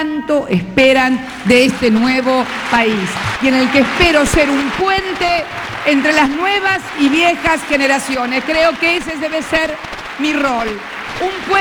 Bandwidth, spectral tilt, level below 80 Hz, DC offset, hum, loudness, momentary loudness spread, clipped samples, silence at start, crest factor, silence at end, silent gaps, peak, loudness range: over 20 kHz; -4 dB/octave; -36 dBFS; under 0.1%; none; -14 LUFS; 9 LU; under 0.1%; 0 s; 14 dB; 0 s; none; 0 dBFS; 3 LU